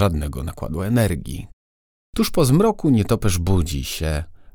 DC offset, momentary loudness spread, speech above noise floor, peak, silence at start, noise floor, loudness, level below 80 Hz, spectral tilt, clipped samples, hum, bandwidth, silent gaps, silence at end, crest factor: under 0.1%; 12 LU; over 71 dB; -4 dBFS; 0 s; under -90 dBFS; -21 LUFS; -32 dBFS; -6 dB/octave; under 0.1%; none; over 20 kHz; 1.53-2.13 s; 0.05 s; 16 dB